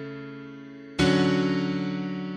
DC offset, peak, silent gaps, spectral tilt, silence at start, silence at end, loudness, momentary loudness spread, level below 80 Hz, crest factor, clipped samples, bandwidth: under 0.1%; -10 dBFS; none; -6 dB/octave; 0 s; 0 s; -25 LUFS; 19 LU; -50 dBFS; 16 dB; under 0.1%; 10.5 kHz